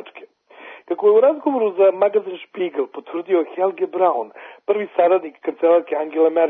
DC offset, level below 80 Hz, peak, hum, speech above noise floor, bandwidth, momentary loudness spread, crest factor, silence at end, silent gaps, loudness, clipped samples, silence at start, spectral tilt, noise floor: under 0.1%; -78 dBFS; -4 dBFS; none; 26 dB; 3.9 kHz; 13 LU; 14 dB; 0 s; none; -19 LUFS; under 0.1%; 0.05 s; -8.5 dB/octave; -44 dBFS